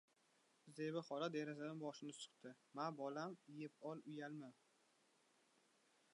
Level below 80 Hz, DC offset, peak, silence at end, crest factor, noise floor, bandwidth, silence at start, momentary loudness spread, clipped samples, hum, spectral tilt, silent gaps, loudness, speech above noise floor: under -90 dBFS; under 0.1%; -32 dBFS; 1.6 s; 20 dB; -79 dBFS; 11 kHz; 0.65 s; 11 LU; under 0.1%; none; -5.5 dB/octave; none; -50 LUFS; 29 dB